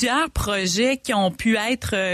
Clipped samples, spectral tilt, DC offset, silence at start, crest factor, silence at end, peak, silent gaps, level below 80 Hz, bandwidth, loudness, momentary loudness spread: under 0.1%; -3.5 dB/octave; under 0.1%; 0 s; 12 dB; 0 s; -8 dBFS; none; -38 dBFS; 15 kHz; -21 LUFS; 3 LU